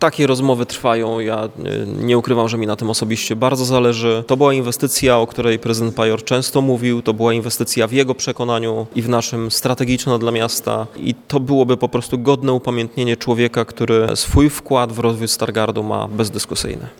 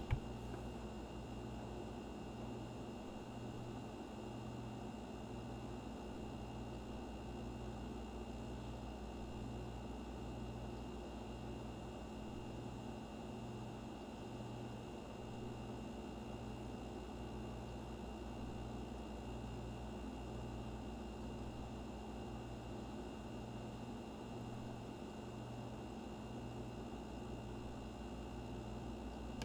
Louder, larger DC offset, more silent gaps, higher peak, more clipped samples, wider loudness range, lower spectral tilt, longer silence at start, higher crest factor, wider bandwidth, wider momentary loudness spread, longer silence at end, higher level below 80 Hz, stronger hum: first, -17 LUFS vs -49 LUFS; neither; neither; first, 0 dBFS vs -24 dBFS; neither; about the same, 2 LU vs 1 LU; second, -5 dB/octave vs -6.5 dB/octave; about the same, 0 s vs 0 s; second, 16 dB vs 24 dB; about the same, 19 kHz vs over 20 kHz; first, 6 LU vs 1 LU; about the same, 0.05 s vs 0 s; first, -38 dBFS vs -56 dBFS; neither